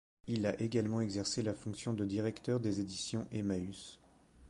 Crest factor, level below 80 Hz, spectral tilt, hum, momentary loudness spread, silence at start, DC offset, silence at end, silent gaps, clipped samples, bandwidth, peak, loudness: 16 dB; -62 dBFS; -5.5 dB/octave; none; 6 LU; 0.25 s; under 0.1%; 0 s; none; under 0.1%; 11.5 kHz; -20 dBFS; -37 LUFS